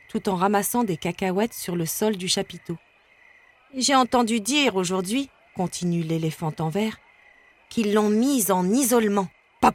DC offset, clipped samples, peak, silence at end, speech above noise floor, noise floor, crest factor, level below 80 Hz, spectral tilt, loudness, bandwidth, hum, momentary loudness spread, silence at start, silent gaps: under 0.1%; under 0.1%; -4 dBFS; 0 s; 33 dB; -56 dBFS; 20 dB; -58 dBFS; -4 dB/octave; -23 LUFS; 17 kHz; none; 11 LU; 0.15 s; none